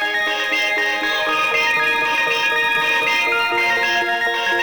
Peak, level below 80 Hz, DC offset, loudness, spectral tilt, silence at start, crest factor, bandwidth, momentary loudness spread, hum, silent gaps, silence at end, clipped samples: -6 dBFS; -54 dBFS; under 0.1%; -16 LUFS; -1 dB/octave; 0 s; 12 dB; 19 kHz; 2 LU; none; none; 0 s; under 0.1%